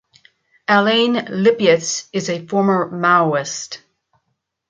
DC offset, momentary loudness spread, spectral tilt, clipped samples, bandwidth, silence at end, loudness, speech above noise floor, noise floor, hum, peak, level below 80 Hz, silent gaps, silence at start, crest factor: under 0.1%; 13 LU; -4 dB/octave; under 0.1%; 9.4 kHz; 0.95 s; -17 LUFS; 56 dB; -73 dBFS; none; -2 dBFS; -66 dBFS; none; 0.7 s; 16 dB